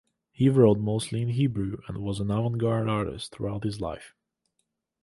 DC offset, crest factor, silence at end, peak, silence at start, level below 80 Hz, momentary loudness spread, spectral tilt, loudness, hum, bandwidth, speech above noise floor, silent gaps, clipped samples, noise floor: under 0.1%; 20 dB; 0.95 s; -6 dBFS; 0.4 s; -52 dBFS; 13 LU; -7.5 dB/octave; -27 LUFS; none; 11.5 kHz; 53 dB; none; under 0.1%; -79 dBFS